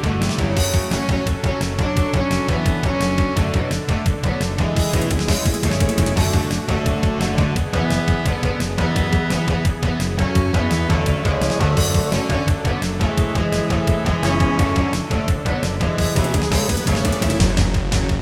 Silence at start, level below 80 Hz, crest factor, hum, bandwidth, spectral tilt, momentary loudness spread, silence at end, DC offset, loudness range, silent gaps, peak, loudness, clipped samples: 0 s; -28 dBFS; 14 dB; none; 18 kHz; -5.5 dB/octave; 3 LU; 0 s; under 0.1%; 1 LU; none; -4 dBFS; -19 LUFS; under 0.1%